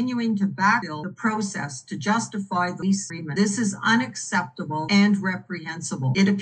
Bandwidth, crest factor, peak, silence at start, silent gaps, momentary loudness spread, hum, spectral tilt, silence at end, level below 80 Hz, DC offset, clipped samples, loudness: 9.8 kHz; 16 dB; -8 dBFS; 0 s; none; 10 LU; none; -4.5 dB/octave; 0 s; -72 dBFS; under 0.1%; under 0.1%; -24 LUFS